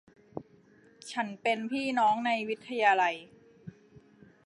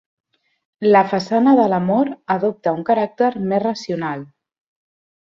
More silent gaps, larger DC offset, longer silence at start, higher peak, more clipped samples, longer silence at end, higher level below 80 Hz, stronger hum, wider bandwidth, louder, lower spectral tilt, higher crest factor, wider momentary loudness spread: neither; neither; second, 0.35 s vs 0.8 s; second, -12 dBFS vs 0 dBFS; neither; second, 0.75 s vs 0.95 s; second, -76 dBFS vs -64 dBFS; neither; first, 11.5 kHz vs 7.4 kHz; second, -29 LUFS vs -18 LUFS; second, -4 dB/octave vs -7 dB/octave; about the same, 20 dB vs 18 dB; first, 25 LU vs 10 LU